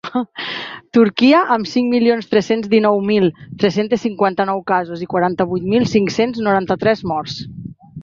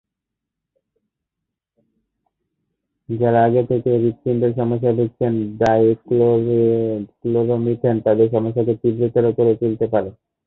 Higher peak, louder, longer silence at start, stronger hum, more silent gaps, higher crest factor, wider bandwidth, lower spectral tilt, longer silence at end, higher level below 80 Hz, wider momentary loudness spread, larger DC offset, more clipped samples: about the same, 0 dBFS vs -2 dBFS; about the same, -16 LUFS vs -18 LUFS; second, 0.05 s vs 3.1 s; neither; neither; about the same, 16 dB vs 16 dB; about the same, 7.4 kHz vs 7 kHz; second, -6 dB/octave vs -10 dB/octave; second, 0 s vs 0.35 s; about the same, -52 dBFS vs -54 dBFS; first, 11 LU vs 5 LU; neither; neither